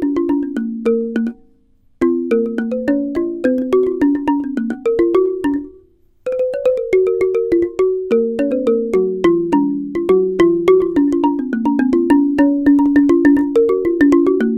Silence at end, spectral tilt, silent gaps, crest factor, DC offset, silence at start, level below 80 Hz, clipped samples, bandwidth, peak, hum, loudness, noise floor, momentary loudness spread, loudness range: 0 s; -7.5 dB/octave; none; 16 dB; under 0.1%; 0 s; -46 dBFS; under 0.1%; 8.6 kHz; 0 dBFS; none; -16 LUFS; -52 dBFS; 8 LU; 5 LU